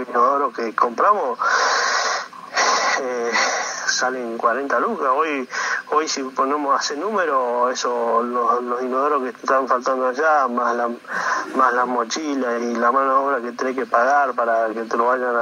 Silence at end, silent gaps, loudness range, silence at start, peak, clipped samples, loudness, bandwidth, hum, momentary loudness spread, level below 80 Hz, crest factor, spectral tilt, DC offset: 0 s; none; 2 LU; 0 s; -2 dBFS; under 0.1%; -20 LUFS; 13 kHz; none; 6 LU; -82 dBFS; 16 dB; -1.5 dB/octave; under 0.1%